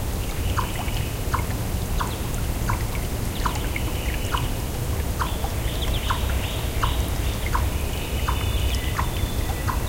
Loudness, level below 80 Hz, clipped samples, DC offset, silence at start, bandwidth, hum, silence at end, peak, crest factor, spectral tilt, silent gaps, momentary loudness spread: -26 LUFS; -28 dBFS; under 0.1%; under 0.1%; 0 s; 17 kHz; none; 0 s; -8 dBFS; 16 dB; -4.5 dB/octave; none; 3 LU